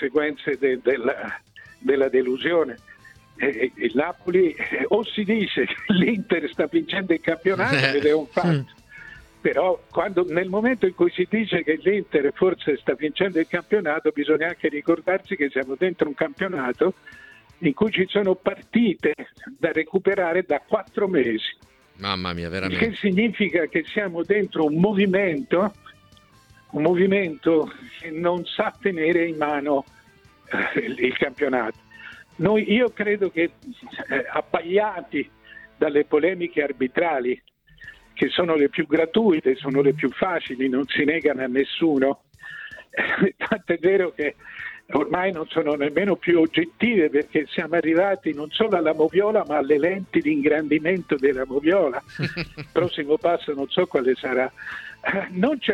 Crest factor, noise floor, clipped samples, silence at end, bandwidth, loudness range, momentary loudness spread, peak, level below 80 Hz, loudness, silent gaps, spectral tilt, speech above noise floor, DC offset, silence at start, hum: 20 dB; -54 dBFS; under 0.1%; 0 s; 9.2 kHz; 3 LU; 8 LU; -2 dBFS; -60 dBFS; -22 LUFS; none; -7.5 dB/octave; 32 dB; under 0.1%; 0 s; none